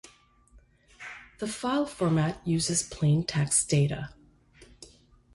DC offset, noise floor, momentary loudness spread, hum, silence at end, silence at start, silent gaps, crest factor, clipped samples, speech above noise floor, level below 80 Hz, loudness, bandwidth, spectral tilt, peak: under 0.1%; -59 dBFS; 19 LU; none; 0.5 s; 1 s; none; 18 dB; under 0.1%; 32 dB; -56 dBFS; -27 LUFS; 11.5 kHz; -4.5 dB/octave; -12 dBFS